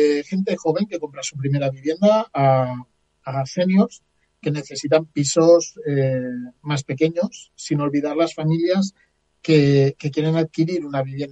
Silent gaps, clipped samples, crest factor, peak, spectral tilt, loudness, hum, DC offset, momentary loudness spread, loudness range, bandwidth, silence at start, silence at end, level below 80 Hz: none; under 0.1%; 18 dB; -2 dBFS; -6 dB/octave; -20 LUFS; none; under 0.1%; 11 LU; 2 LU; 9.2 kHz; 0 s; 0 s; -60 dBFS